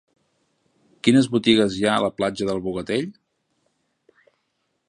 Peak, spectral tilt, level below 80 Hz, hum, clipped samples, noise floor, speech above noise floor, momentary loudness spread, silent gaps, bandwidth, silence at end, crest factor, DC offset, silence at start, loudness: -2 dBFS; -5 dB/octave; -56 dBFS; none; under 0.1%; -73 dBFS; 53 dB; 9 LU; none; 10.5 kHz; 1.75 s; 22 dB; under 0.1%; 1.05 s; -21 LUFS